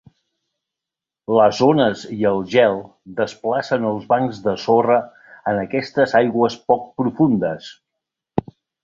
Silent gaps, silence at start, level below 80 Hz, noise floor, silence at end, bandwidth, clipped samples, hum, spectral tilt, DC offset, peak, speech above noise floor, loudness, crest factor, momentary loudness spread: none; 1.3 s; -56 dBFS; -87 dBFS; 0.45 s; 7.6 kHz; under 0.1%; none; -6.5 dB/octave; under 0.1%; -2 dBFS; 69 dB; -19 LUFS; 18 dB; 12 LU